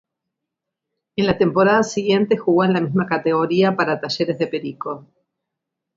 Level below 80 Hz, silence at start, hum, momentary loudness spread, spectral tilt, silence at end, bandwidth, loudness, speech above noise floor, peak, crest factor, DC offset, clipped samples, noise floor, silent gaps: -54 dBFS; 1.15 s; none; 12 LU; -6 dB/octave; 0.95 s; 7.8 kHz; -19 LUFS; 64 dB; -2 dBFS; 18 dB; under 0.1%; under 0.1%; -82 dBFS; none